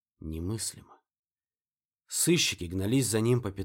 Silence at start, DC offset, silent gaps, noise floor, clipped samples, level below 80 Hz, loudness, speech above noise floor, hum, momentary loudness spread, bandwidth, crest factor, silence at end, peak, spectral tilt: 0.2 s; under 0.1%; 1.19-1.23 s; under -90 dBFS; under 0.1%; -54 dBFS; -28 LUFS; over 61 dB; none; 12 LU; 19 kHz; 18 dB; 0 s; -12 dBFS; -4 dB/octave